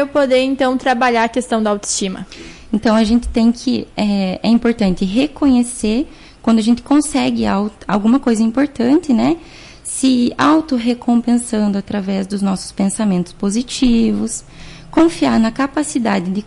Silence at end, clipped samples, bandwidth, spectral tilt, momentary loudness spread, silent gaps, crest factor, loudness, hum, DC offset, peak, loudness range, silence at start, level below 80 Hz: 0 s; under 0.1%; 11.5 kHz; -5 dB/octave; 7 LU; none; 10 dB; -16 LUFS; none; under 0.1%; -4 dBFS; 2 LU; 0 s; -38 dBFS